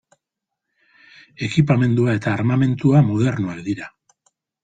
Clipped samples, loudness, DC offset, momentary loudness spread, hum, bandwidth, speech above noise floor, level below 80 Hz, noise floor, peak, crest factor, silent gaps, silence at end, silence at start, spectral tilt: under 0.1%; -19 LUFS; under 0.1%; 12 LU; none; 9 kHz; 65 dB; -52 dBFS; -82 dBFS; -4 dBFS; 16 dB; none; 0.75 s; 1.4 s; -8 dB/octave